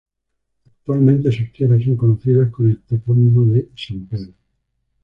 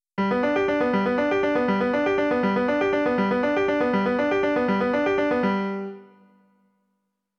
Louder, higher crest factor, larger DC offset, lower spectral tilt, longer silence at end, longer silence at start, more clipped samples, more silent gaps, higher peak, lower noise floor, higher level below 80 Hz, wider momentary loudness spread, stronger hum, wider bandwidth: first, -16 LUFS vs -23 LUFS; about the same, 14 dB vs 12 dB; neither; first, -10.5 dB/octave vs -7.5 dB/octave; second, 0.75 s vs 1.35 s; first, 0.9 s vs 0.15 s; neither; neither; first, -2 dBFS vs -10 dBFS; about the same, -73 dBFS vs -76 dBFS; first, -46 dBFS vs -56 dBFS; first, 15 LU vs 1 LU; neither; second, 5.4 kHz vs 7 kHz